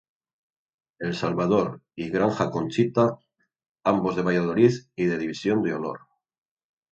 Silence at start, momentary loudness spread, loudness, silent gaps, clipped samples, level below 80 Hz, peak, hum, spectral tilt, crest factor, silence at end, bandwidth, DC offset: 1 s; 10 LU; -25 LUFS; 3.69-3.75 s; under 0.1%; -60 dBFS; -6 dBFS; none; -7 dB/octave; 20 dB; 0.95 s; 8.2 kHz; under 0.1%